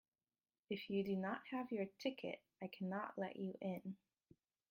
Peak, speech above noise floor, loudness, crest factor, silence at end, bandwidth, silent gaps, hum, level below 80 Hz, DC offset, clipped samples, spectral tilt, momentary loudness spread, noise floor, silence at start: -28 dBFS; over 45 dB; -46 LUFS; 18 dB; 0.75 s; 16.5 kHz; none; none; -86 dBFS; under 0.1%; under 0.1%; -7 dB/octave; 9 LU; under -90 dBFS; 0.7 s